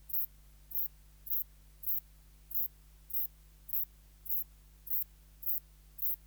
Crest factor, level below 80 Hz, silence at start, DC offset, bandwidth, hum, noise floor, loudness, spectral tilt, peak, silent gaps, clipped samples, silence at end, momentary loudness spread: 24 dB; -60 dBFS; 0 s; under 0.1%; over 20 kHz; 50 Hz at -60 dBFS; -58 dBFS; -35 LUFS; -3 dB/octave; -16 dBFS; none; under 0.1%; 0 s; 10 LU